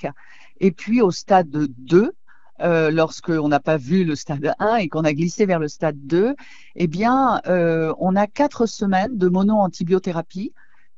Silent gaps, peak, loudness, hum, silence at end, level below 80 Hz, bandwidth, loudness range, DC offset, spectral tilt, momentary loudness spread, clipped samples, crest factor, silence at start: none; -2 dBFS; -20 LUFS; none; 0.5 s; -54 dBFS; 7.8 kHz; 2 LU; 0.9%; -7 dB/octave; 7 LU; under 0.1%; 18 dB; 0.05 s